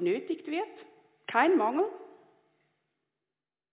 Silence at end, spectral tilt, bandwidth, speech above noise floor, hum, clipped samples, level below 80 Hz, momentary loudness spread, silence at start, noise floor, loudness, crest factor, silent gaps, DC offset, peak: 1.65 s; -3 dB/octave; 4 kHz; over 61 dB; none; under 0.1%; under -90 dBFS; 18 LU; 0 s; under -90 dBFS; -29 LUFS; 22 dB; none; under 0.1%; -10 dBFS